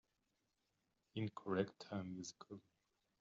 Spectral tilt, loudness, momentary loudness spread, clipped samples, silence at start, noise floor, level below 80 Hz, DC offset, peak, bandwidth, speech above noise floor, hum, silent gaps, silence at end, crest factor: -6 dB/octave; -46 LUFS; 16 LU; under 0.1%; 1.15 s; -86 dBFS; -86 dBFS; under 0.1%; -24 dBFS; 7.6 kHz; 41 dB; none; none; 0.6 s; 24 dB